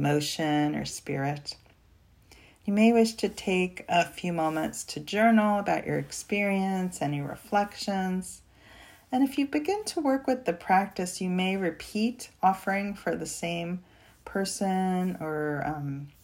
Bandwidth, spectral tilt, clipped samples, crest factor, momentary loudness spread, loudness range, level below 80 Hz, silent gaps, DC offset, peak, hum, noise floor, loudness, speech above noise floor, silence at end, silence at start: 16 kHz; -5 dB/octave; under 0.1%; 18 dB; 10 LU; 4 LU; -60 dBFS; none; under 0.1%; -10 dBFS; none; -59 dBFS; -28 LUFS; 32 dB; 0.15 s; 0 s